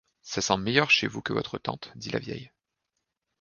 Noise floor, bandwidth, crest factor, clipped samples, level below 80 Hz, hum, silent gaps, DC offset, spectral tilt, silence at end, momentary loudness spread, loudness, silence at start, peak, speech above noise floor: -83 dBFS; 10 kHz; 26 dB; under 0.1%; -60 dBFS; none; none; under 0.1%; -3.5 dB/octave; 0.95 s; 16 LU; -27 LUFS; 0.25 s; -4 dBFS; 54 dB